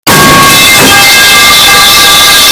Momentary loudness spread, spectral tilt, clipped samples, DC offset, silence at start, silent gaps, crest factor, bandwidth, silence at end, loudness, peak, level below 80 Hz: 1 LU; -1 dB/octave; 20%; under 0.1%; 0.05 s; none; 2 dB; over 20 kHz; 0 s; 0 LUFS; 0 dBFS; -28 dBFS